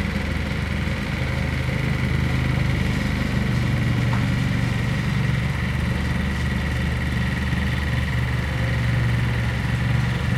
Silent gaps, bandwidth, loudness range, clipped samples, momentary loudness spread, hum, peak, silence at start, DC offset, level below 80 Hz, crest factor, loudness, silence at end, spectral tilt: none; 14 kHz; 1 LU; under 0.1%; 3 LU; none; -8 dBFS; 0 s; under 0.1%; -30 dBFS; 14 dB; -23 LUFS; 0 s; -6.5 dB/octave